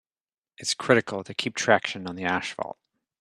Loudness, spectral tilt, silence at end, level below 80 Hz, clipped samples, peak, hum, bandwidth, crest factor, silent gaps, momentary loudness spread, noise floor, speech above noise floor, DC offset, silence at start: -26 LUFS; -3.5 dB/octave; 0.5 s; -70 dBFS; under 0.1%; -2 dBFS; none; 13.5 kHz; 24 dB; none; 11 LU; under -90 dBFS; over 64 dB; under 0.1%; 0.6 s